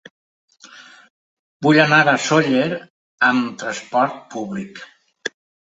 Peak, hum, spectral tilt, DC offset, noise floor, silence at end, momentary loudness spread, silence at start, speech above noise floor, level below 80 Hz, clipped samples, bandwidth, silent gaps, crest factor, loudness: -2 dBFS; none; -4.5 dB/octave; under 0.1%; -44 dBFS; 0.4 s; 18 LU; 0.75 s; 27 dB; -64 dBFS; under 0.1%; 8.2 kHz; 1.10-1.60 s, 2.90-3.18 s; 18 dB; -17 LUFS